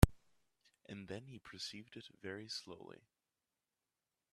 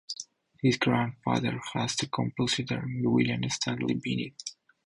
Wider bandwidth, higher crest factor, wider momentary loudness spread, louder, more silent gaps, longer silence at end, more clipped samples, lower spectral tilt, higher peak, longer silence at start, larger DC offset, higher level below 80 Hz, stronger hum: first, 13.5 kHz vs 11 kHz; first, 34 dB vs 18 dB; about the same, 12 LU vs 12 LU; second, -46 LUFS vs -29 LUFS; neither; first, 1.5 s vs 0.35 s; neither; about the same, -5.5 dB/octave vs -4.5 dB/octave; about the same, -8 dBFS vs -10 dBFS; about the same, 0 s vs 0.1 s; neither; first, -48 dBFS vs -60 dBFS; neither